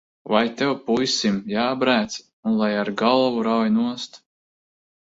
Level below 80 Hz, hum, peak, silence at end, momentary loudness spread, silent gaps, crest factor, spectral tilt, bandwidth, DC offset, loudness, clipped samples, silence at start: -62 dBFS; none; -4 dBFS; 0.95 s; 7 LU; 2.33-2.43 s; 18 dB; -4.5 dB/octave; 7.8 kHz; under 0.1%; -21 LUFS; under 0.1%; 0.25 s